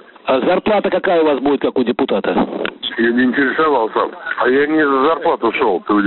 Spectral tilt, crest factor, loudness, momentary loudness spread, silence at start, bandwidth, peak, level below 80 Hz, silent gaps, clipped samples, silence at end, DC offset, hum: -3 dB/octave; 12 dB; -16 LUFS; 5 LU; 0.25 s; 4.3 kHz; -2 dBFS; -54 dBFS; none; under 0.1%; 0 s; under 0.1%; none